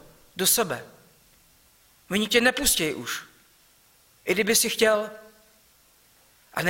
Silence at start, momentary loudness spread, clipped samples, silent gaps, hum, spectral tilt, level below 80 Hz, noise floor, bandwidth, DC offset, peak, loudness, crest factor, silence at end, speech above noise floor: 0.35 s; 15 LU; under 0.1%; none; none; -2 dB/octave; -52 dBFS; -59 dBFS; 16.5 kHz; under 0.1%; -6 dBFS; -23 LUFS; 22 dB; 0 s; 36 dB